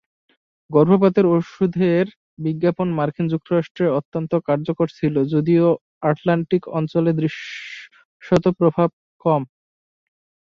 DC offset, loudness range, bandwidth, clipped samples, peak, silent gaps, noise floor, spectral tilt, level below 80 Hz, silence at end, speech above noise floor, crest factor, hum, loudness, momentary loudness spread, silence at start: under 0.1%; 3 LU; 7 kHz; under 0.1%; -2 dBFS; 2.16-2.37 s, 3.70-3.75 s, 4.05-4.12 s, 5.81-6.01 s, 8.05-8.20 s, 8.93-9.20 s; under -90 dBFS; -9 dB/octave; -58 dBFS; 1 s; over 71 dB; 18 dB; none; -20 LUFS; 10 LU; 0.7 s